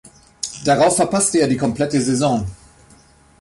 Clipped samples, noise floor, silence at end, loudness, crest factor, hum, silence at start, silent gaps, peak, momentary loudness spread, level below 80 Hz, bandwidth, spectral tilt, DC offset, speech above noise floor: under 0.1%; -50 dBFS; 0.85 s; -17 LUFS; 16 dB; none; 0.05 s; none; -4 dBFS; 12 LU; -46 dBFS; 11.5 kHz; -4.5 dB/octave; under 0.1%; 33 dB